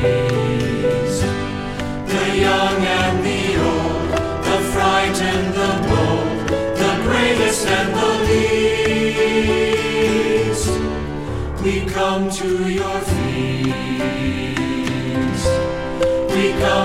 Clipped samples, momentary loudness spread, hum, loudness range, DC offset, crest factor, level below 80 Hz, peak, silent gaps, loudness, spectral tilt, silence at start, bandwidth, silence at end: under 0.1%; 6 LU; none; 4 LU; under 0.1%; 16 dB; -34 dBFS; -2 dBFS; none; -18 LUFS; -5 dB/octave; 0 s; 16 kHz; 0 s